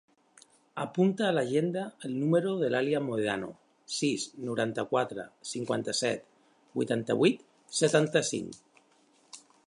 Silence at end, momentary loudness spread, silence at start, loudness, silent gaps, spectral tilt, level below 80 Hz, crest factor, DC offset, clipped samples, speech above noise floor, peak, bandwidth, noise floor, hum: 0.3 s; 13 LU; 0.75 s; -30 LUFS; none; -4.5 dB/octave; -74 dBFS; 20 dB; under 0.1%; under 0.1%; 36 dB; -10 dBFS; 11.5 kHz; -65 dBFS; none